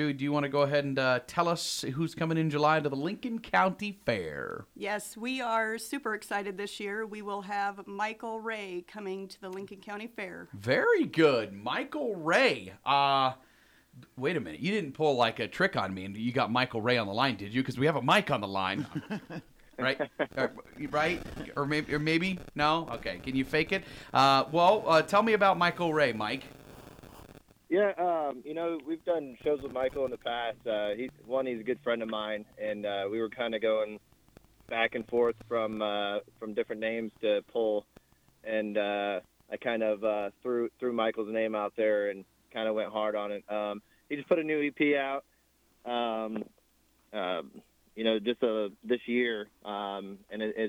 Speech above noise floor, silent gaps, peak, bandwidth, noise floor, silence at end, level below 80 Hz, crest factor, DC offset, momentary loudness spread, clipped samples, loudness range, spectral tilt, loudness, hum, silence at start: 38 dB; none; -12 dBFS; 17 kHz; -68 dBFS; 0 s; -62 dBFS; 18 dB; under 0.1%; 13 LU; under 0.1%; 6 LU; -5 dB/octave; -30 LUFS; none; 0 s